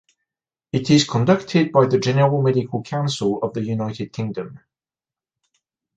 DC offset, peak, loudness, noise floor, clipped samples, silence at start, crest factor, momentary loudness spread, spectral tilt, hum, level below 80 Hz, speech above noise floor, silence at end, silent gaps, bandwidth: under 0.1%; -2 dBFS; -20 LUFS; under -90 dBFS; under 0.1%; 0.75 s; 18 dB; 11 LU; -6 dB/octave; none; -58 dBFS; over 71 dB; 1.4 s; none; 9.2 kHz